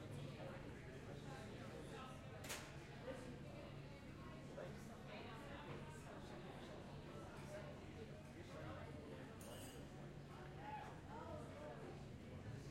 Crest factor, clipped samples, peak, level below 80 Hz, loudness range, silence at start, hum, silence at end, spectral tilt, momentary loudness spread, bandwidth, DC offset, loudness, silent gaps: 18 dB; under 0.1%; -36 dBFS; -66 dBFS; 1 LU; 0 s; none; 0 s; -5.5 dB/octave; 3 LU; 15.5 kHz; under 0.1%; -55 LUFS; none